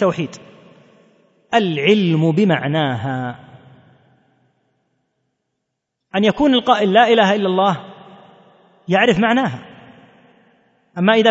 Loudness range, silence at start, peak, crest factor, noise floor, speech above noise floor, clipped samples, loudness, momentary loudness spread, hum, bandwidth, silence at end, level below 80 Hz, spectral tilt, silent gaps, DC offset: 10 LU; 0 s; 0 dBFS; 18 dB; -77 dBFS; 62 dB; under 0.1%; -16 LUFS; 15 LU; none; 8 kHz; 0 s; -56 dBFS; -6.5 dB/octave; none; under 0.1%